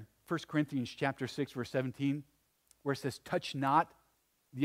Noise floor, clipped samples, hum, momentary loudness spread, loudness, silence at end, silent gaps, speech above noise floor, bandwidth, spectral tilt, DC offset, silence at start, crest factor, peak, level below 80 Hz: -75 dBFS; under 0.1%; none; 10 LU; -36 LUFS; 0 s; none; 40 dB; 16 kHz; -6 dB/octave; under 0.1%; 0 s; 22 dB; -14 dBFS; -74 dBFS